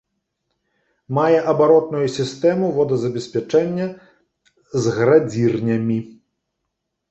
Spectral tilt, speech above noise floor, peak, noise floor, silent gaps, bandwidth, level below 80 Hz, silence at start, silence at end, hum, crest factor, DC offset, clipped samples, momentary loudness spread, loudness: -7 dB/octave; 60 dB; -2 dBFS; -77 dBFS; none; 8.2 kHz; -60 dBFS; 1.1 s; 1 s; none; 18 dB; under 0.1%; under 0.1%; 10 LU; -19 LUFS